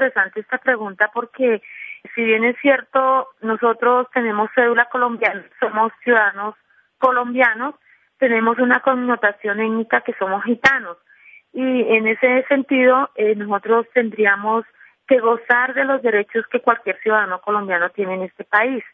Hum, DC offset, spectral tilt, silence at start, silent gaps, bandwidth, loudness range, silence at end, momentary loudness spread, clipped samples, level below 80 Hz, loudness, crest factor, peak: none; under 0.1%; -6 dB/octave; 0 s; none; 7.2 kHz; 2 LU; 0.1 s; 7 LU; under 0.1%; -66 dBFS; -18 LUFS; 18 dB; 0 dBFS